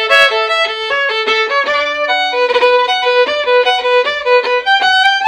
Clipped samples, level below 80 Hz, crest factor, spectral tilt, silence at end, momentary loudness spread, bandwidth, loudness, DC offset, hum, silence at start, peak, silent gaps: under 0.1%; -54 dBFS; 12 dB; 0 dB/octave; 0 s; 5 LU; 11 kHz; -12 LUFS; under 0.1%; none; 0 s; 0 dBFS; none